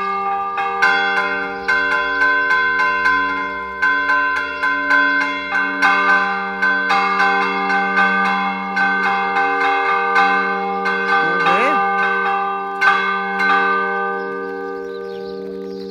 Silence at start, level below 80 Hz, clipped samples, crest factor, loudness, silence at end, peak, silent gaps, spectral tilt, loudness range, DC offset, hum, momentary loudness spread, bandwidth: 0 s; -54 dBFS; under 0.1%; 18 dB; -16 LUFS; 0 s; 0 dBFS; none; -4 dB/octave; 1 LU; under 0.1%; none; 9 LU; 13 kHz